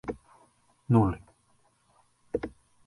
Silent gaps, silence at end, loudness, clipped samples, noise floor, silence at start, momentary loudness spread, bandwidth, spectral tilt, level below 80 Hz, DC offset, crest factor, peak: none; 0.4 s; -29 LUFS; under 0.1%; -67 dBFS; 0.05 s; 18 LU; 11.5 kHz; -10 dB/octave; -52 dBFS; under 0.1%; 24 dB; -8 dBFS